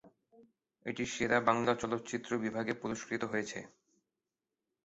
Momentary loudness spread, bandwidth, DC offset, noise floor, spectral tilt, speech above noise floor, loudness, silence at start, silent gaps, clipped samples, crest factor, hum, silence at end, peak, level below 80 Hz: 13 LU; 8 kHz; under 0.1%; -90 dBFS; -4 dB/octave; 55 dB; -35 LUFS; 0.05 s; none; under 0.1%; 26 dB; none; 1.15 s; -12 dBFS; -68 dBFS